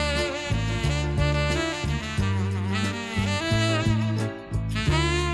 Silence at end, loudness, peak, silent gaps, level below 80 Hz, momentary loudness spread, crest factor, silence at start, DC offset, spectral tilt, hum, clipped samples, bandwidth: 0 s; -25 LUFS; -10 dBFS; none; -34 dBFS; 5 LU; 16 dB; 0 s; under 0.1%; -5.5 dB/octave; none; under 0.1%; 12.5 kHz